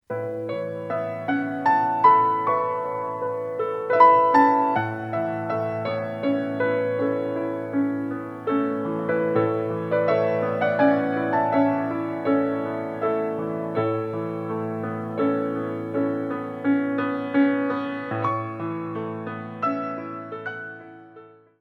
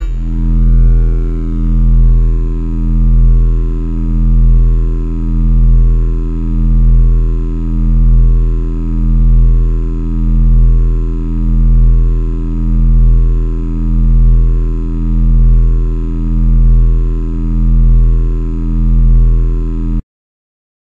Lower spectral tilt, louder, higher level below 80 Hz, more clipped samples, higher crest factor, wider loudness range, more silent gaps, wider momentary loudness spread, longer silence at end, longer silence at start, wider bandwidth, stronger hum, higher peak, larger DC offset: second, -9 dB/octave vs -11 dB/octave; second, -24 LUFS vs -14 LUFS; second, -70 dBFS vs -10 dBFS; neither; first, 20 dB vs 8 dB; first, 6 LU vs 1 LU; neither; first, 12 LU vs 7 LU; second, 0.3 s vs 0.8 s; about the same, 0.1 s vs 0 s; first, 5.8 kHz vs 1.4 kHz; neither; about the same, -4 dBFS vs -2 dBFS; neither